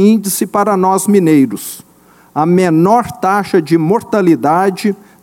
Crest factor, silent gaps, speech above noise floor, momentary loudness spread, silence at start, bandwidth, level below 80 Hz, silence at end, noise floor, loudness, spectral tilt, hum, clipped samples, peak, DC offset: 12 dB; none; 32 dB; 9 LU; 0 s; 17 kHz; -54 dBFS; 0.3 s; -43 dBFS; -12 LUFS; -6 dB/octave; none; under 0.1%; 0 dBFS; under 0.1%